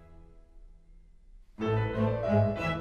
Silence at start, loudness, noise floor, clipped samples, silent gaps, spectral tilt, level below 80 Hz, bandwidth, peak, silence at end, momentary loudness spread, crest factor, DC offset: 0 s; -29 LUFS; -55 dBFS; under 0.1%; none; -8.5 dB/octave; -50 dBFS; 7 kHz; -12 dBFS; 0 s; 5 LU; 20 dB; under 0.1%